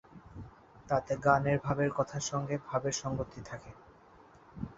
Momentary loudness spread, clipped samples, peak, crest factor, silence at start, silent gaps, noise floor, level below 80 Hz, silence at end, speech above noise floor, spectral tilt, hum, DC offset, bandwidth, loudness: 23 LU; under 0.1%; -10 dBFS; 24 dB; 0.15 s; none; -58 dBFS; -58 dBFS; 0.05 s; 26 dB; -5.5 dB/octave; none; under 0.1%; 8 kHz; -32 LUFS